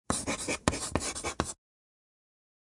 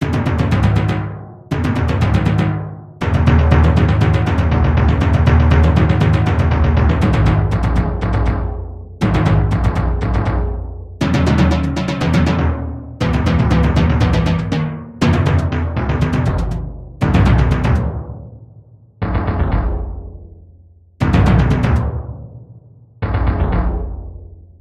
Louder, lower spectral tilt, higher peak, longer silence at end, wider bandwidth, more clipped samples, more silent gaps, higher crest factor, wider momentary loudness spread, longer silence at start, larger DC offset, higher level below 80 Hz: second, -33 LUFS vs -16 LUFS; second, -3 dB/octave vs -8 dB/octave; second, -6 dBFS vs 0 dBFS; first, 1.15 s vs 0.2 s; first, 11.5 kHz vs 8.8 kHz; neither; neither; first, 28 dB vs 14 dB; second, 6 LU vs 14 LU; about the same, 0.1 s vs 0 s; neither; second, -50 dBFS vs -20 dBFS